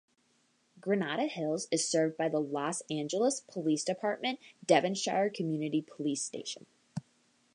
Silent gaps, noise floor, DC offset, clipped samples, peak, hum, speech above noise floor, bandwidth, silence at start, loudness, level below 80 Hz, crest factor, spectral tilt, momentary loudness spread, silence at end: none; -72 dBFS; under 0.1%; under 0.1%; -10 dBFS; none; 40 dB; 11 kHz; 0.75 s; -32 LUFS; -82 dBFS; 22 dB; -4 dB/octave; 13 LU; 0.55 s